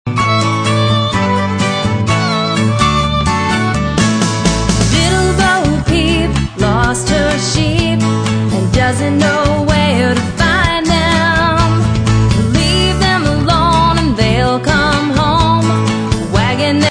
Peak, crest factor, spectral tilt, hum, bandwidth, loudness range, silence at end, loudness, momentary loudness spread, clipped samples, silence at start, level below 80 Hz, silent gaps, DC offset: 0 dBFS; 12 dB; -5 dB/octave; none; 10.5 kHz; 2 LU; 0 s; -12 LUFS; 3 LU; under 0.1%; 0.05 s; -24 dBFS; none; under 0.1%